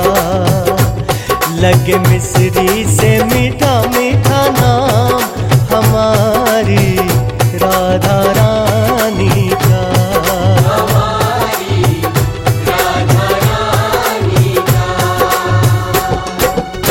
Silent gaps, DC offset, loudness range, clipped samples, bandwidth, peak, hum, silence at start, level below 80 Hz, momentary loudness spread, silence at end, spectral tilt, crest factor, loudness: none; under 0.1%; 2 LU; under 0.1%; 17 kHz; 0 dBFS; none; 0 s; -28 dBFS; 4 LU; 0 s; -5.5 dB/octave; 10 dB; -11 LUFS